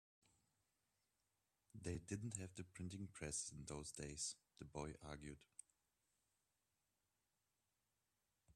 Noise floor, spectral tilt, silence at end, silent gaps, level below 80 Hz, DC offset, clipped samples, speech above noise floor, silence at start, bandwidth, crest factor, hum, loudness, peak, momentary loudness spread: -90 dBFS; -4 dB/octave; 0.05 s; none; -72 dBFS; under 0.1%; under 0.1%; 38 dB; 1.75 s; 13 kHz; 26 dB; none; -51 LUFS; -30 dBFS; 11 LU